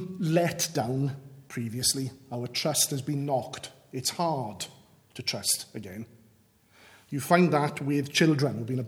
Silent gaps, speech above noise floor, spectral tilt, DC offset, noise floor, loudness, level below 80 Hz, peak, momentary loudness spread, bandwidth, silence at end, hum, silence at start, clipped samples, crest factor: none; 34 dB; -4 dB/octave; under 0.1%; -62 dBFS; -28 LUFS; -68 dBFS; -6 dBFS; 16 LU; over 20 kHz; 0 s; none; 0 s; under 0.1%; 24 dB